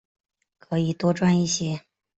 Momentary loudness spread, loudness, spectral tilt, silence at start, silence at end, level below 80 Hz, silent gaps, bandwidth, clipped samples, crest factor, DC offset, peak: 10 LU; -24 LUFS; -5.5 dB/octave; 0.7 s; 0.4 s; -60 dBFS; none; 8.2 kHz; under 0.1%; 16 dB; under 0.1%; -10 dBFS